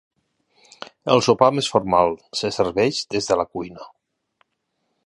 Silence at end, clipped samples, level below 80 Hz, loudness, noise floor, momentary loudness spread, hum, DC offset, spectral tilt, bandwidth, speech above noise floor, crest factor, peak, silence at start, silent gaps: 1.2 s; under 0.1%; -54 dBFS; -20 LUFS; -74 dBFS; 15 LU; none; under 0.1%; -4.5 dB/octave; 11.5 kHz; 54 dB; 22 dB; 0 dBFS; 0.8 s; none